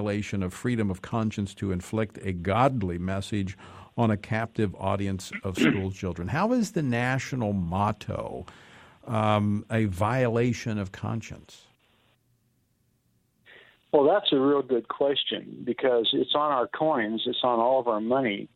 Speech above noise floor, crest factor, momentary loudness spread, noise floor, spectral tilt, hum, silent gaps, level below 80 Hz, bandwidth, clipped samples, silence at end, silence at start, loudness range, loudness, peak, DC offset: 43 dB; 20 dB; 10 LU; -70 dBFS; -6 dB/octave; none; none; -58 dBFS; 15 kHz; under 0.1%; 0.1 s; 0 s; 5 LU; -27 LUFS; -6 dBFS; under 0.1%